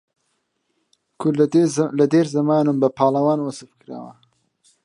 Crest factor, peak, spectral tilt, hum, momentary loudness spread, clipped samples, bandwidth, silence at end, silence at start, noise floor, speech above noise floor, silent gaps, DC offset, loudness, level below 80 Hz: 18 dB; -4 dBFS; -7 dB/octave; none; 19 LU; under 0.1%; 11 kHz; 0.75 s; 1.2 s; -71 dBFS; 53 dB; none; under 0.1%; -19 LUFS; -70 dBFS